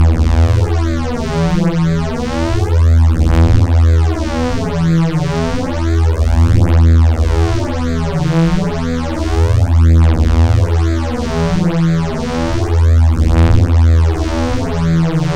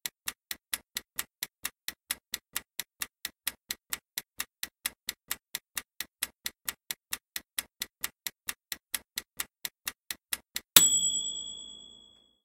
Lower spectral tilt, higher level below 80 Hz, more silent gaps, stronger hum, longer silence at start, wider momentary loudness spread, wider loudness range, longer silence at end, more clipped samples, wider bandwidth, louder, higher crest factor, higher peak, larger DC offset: first, -7.5 dB/octave vs 1.5 dB/octave; first, -16 dBFS vs -66 dBFS; neither; neither; about the same, 0 s vs 0.05 s; second, 7 LU vs 13 LU; second, 1 LU vs 10 LU; second, 0 s vs 0.55 s; neither; second, 9.4 kHz vs 17 kHz; first, -14 LUFS vs -32 LUFS; second, 12 dB vs 36 dB; about the same, 0 dBFS vs 0 dBFS; neither